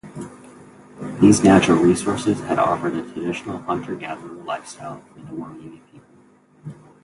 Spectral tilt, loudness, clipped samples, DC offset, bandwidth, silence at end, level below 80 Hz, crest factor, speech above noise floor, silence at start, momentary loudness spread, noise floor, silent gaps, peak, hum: -5.5 dB/octave; -19 LUFS; under 0.1%; under 0.1%; 11.5 kHz; 0.3 s; -50 dBFS; 20 dB; 33 dB; 0.05 s; 25 LU; -53 dBFS; none; 0 dBFS; none